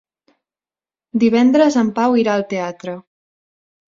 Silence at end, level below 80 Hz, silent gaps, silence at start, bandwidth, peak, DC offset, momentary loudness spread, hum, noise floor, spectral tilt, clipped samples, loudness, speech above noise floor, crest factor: 0.85 s; -62 dBFS; none; 1.15 s; 7.6 kHz; -2 dBFS; under 0.1%; 17 LU; none; under -90 dBFS; -6 dB/octave; under 0.1%; -16 LUFS; over 75 dB; 16 dB